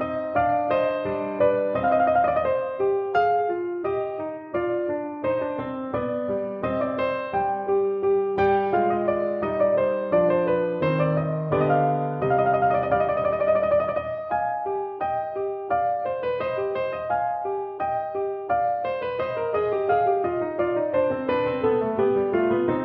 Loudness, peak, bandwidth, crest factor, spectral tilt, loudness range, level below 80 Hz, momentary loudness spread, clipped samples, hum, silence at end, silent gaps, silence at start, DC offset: -24 LUFS; -8 dBFS; 5.4 kHz; 14 dB; -6 dB/octave; 4 LU; -54 dBFS; 7 LU; under 0.1%; none; 0 s; none; 0 s; under 0.1%